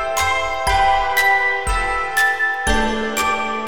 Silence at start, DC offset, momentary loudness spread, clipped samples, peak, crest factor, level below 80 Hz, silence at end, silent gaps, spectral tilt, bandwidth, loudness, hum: 0 s; 2%; 5 LU; under 0.1%; -4 dBFS; 14 dB; -30 dBFS; 0 s; none; -2.5 dB/octave; over 20 kHz; -17 LUFS; none